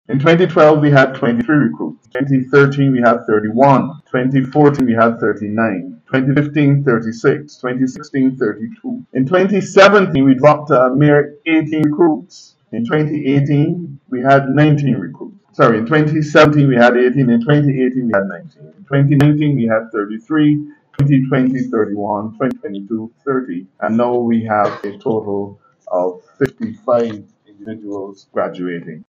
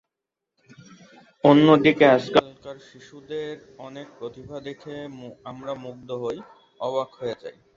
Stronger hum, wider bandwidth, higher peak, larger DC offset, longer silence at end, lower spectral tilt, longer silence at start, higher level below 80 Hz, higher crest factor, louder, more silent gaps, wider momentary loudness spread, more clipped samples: neither; about the same, 7.6 kHz vs 7.4 kHz; about the same, 0 dBFS vs -2 dBFS; neither; second, 0.05 s vs 0.25 s; about the same, -8 dB/octave vs -7 dB/octave; second, 0.1 s vs 1.45 s; first, -54 dBFS vs -64 dBFS; second, 14 dB vs 22 dB; first, -14 LUFS vs -20 LUFS; neither; second, 14 LU vs 24 LU; neither